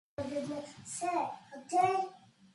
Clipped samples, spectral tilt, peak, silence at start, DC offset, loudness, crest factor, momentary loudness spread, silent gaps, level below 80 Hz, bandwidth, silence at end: under 0.1%; -4 dB/octave; -16 dBFS; 0.2 s; under 0.1%; -35 LUFS; 18 dB; 13 LU; none; -70 dBFS; 11.5 kHz; 0.35 s